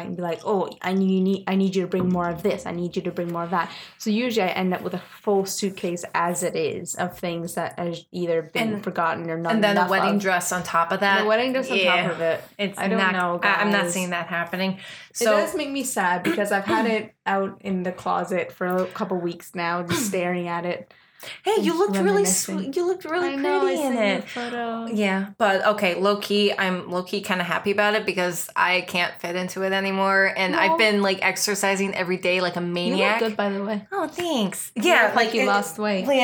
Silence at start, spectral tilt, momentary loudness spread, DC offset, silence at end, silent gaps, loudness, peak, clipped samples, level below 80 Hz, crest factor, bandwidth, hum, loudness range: 0 s; -4 dB/octave; 9 LU; under 0.1%; 0 s; none; -23 LUFS; -4 dBFS; under 0.1%; -66 dBFS; 18 dB; over 20 kHz; none; 5 LU